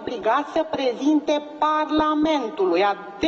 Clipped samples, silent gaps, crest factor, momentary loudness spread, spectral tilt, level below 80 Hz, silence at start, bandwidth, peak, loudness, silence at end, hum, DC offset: under 0.1%; none; 12 dB; 4 LU; -4.5 dB/octave; -56 dBFS; 0 s; 7.2 kHz; -8 dBFS; -22 LUFS; 0 s; none; under 0.1%